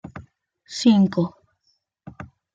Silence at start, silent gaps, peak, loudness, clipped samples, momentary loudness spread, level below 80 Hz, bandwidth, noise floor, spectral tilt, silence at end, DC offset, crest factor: 0.05 s; none; -6 dBFS; -20 LUFS; under 0.1%; 25 LU; -60 dBFS; 9 kHz; -70 dBFS; -6.5 dB/octave; 0.3 s; under 0.1%; 18 dB